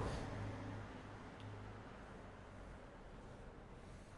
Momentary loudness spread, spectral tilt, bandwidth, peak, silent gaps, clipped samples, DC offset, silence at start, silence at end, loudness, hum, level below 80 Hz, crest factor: 10 LU; -6.5 dB/octave; 11.5 kHz; -32 dBFS; none; under 0.1%; under 0.1%; 0 s; 0 s; -53 LUFS; none; -58 dBFS; 18 dB